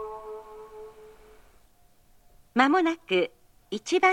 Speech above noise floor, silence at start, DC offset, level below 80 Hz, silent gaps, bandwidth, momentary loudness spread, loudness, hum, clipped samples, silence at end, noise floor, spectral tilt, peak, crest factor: 37 dB; 0 s; under 0.1%; -62 dBFS; none; 11.5 kHz; 23 LU; -26 LUFS; none; under 0.1%; 0 s; -60 dBFS; -4 dB/octave; -6 dBFS; 24 dB